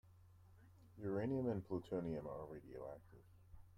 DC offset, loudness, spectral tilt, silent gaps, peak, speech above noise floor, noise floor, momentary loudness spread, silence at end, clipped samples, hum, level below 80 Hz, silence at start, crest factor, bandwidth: under 0.1%; -46 LUFS; -9.5 dB/octave; none; -30 dBFS; 21 dB; -66 dBFS; 25 LU; 0 s; under 0.1%; none; -70 dBFS; 0.05 s; 16 dB; 15.5 kHz